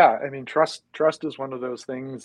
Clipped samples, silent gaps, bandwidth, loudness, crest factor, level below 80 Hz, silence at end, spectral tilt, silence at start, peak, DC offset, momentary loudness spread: under 0.1%; none; 11 kHz; -25 LUFS; 20 dB; -74 dBFS; 0 s; -5 dB/octave; 0 s; -2 dBFS; under 0.1%; 9 LU